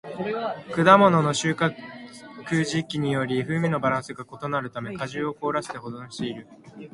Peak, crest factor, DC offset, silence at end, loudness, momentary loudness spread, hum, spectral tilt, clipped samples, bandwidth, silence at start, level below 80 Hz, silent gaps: 0 dBFS; 24 dB; under 0.1%; 0.05 s; -24 LUFS; 22 LU; none; -5.5 dB/octave; under 0.1%; 11.5 kHz; 0.05 s; -62 dBFS; none